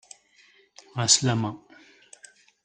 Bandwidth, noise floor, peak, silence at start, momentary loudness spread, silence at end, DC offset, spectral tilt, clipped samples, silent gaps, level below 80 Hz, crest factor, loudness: 9.6 kHz; -59 dBFS; -4 dBFS; 0.95 s; 19 LU; 1.05 s; under 0.1%; -2.5 dB/octave; under 0.1%; none; -64 dBFS; 26 dB; -22 LUFS